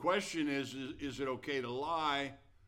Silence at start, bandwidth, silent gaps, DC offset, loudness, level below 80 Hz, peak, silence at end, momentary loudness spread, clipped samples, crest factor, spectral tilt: 0 s; 16 kHz; none; under 0.1%; -37 LUFS; -64 dBFS; -20 dBFS; 0.3 s; 8 LU; under 0.1%; 18 dB; -4 dB/octave